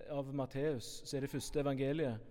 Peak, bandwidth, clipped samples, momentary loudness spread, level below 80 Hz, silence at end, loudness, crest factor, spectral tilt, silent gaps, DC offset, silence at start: -24 dBFS; 17 kHz; under 0.1%; 6 LU; -56 dBFS; 0 s; -39 LUFS; 14 dB; -6 dB/octave; none; under 0.1%; 0 s